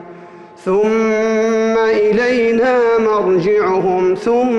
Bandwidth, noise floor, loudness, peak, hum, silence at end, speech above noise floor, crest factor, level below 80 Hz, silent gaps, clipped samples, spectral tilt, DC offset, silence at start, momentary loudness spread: 8.2 kHz; -37 dBFS; -14 LUFS; -6 dBFS; none; 0 s; 24 dB; 8 dB; -50 dBFS; none; under 0.1%; -6 dB/octave; under 0.1%; 0 s; 2 LU